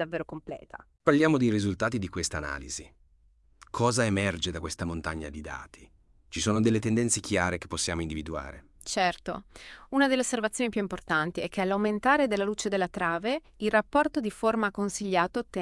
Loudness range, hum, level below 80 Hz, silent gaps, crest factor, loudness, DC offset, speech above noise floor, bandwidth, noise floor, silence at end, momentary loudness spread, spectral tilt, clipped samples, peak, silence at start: 4 LU; none; -52 dBFS; none; 20 dB; -28 LUFS; under 0.1%; 34 dB; 12 kHz; -62 dBFS; 0 s; 14 LU; -4.5 dB/octave; under 0.1%; -8 dBFS; 0 s